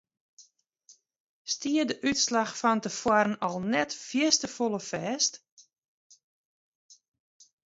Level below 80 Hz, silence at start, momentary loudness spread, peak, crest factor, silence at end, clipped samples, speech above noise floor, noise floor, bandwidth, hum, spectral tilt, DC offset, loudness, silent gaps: -68 dBFS; 0.4 s; 8 LU; -8 dBFS; 22 dB; 0.7 s; under 0.1%; 34 dB; -61 dBFS; 8 kHz; none; -2.5 dB/octave; under 0.1%; -27 LUFS; 1.20-1.45 s, 5.52-5.57 s, 5.78-5.82 s, 5.88-6.10 s, 6.24-6.89 s